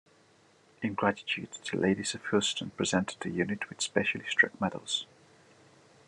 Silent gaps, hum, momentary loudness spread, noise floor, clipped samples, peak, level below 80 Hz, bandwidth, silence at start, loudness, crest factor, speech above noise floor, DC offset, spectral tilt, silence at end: none; none; 8 LU; -63 dBFS; under 0.1%; -10 dBFS; -74 dBFS; 11.5 kHz; 0.8 s; -31 LUFS; 24 dB; 32 dB; under 0.1%; -3.5 dB/octave; 1.05 s